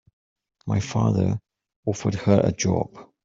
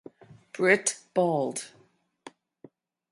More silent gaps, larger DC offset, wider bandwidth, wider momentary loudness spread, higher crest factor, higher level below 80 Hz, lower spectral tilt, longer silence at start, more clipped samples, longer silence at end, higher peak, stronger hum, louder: first, 1.76-1.83 s vs none; neither; second, 7.6 kHz vs 11.5 kHz; second, 12 LU vs 20 LU; about the same, 20 dB vs 24 dB; first, -52 dBFS vs -80 dBFS; first, -6.5 dB/octave vs -3.5 dB/octave; first, 0.65 s vs 0.3 s; neither; second, 0.2 s vs 1.45 s; about the same, -4 dBFS vs -6 dBFS; neither; about the same, -24 LUFS vs -26 LUFS